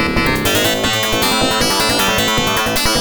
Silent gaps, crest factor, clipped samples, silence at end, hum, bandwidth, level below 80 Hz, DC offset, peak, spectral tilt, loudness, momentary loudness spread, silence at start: none; 14 dB; under 0.1%; 0 s; none; over 20 kHz; -32 dBFS; under 0.1%; -2 dBFS; -2.5 dB/octave; -14 LUFS; 2 LU; 0 s